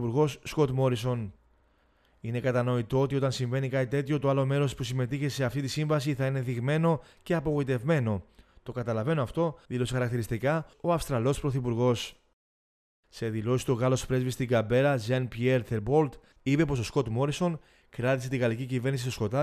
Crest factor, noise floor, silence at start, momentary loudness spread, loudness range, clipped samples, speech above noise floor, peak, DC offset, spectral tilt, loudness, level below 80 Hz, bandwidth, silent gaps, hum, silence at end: 16 dB; -66 dBFS; 0 s; 6 LU; 3 LU; under 0.1%; 38 dB; -12 dBFS; under 0.1%; -6.5 dB/octave; -29 LUFS; -52 dBFS; 14 kHz; 12.33-13.03 s; none; 0 s